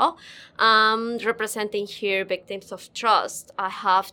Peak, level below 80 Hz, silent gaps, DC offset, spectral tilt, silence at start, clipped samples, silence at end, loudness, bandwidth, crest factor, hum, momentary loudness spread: -6 dBFS; -70 dBFS; none; under 0.1%; -2 dB/octave; 0 s; under 0.1%; 0 s; -23 LUFS; 19 kHz; 18 dB; none; 17 LU